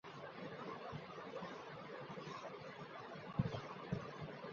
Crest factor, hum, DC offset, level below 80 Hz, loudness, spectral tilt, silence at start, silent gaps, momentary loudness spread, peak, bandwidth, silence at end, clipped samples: 26 dB; none; under 0.1%; -68 dBFS; -49 LUFS; -5.5 dB/octave; 0.05 s; none; 8 LU; -22 dBFS; 7.2 kHz; 0 s; under 0.1%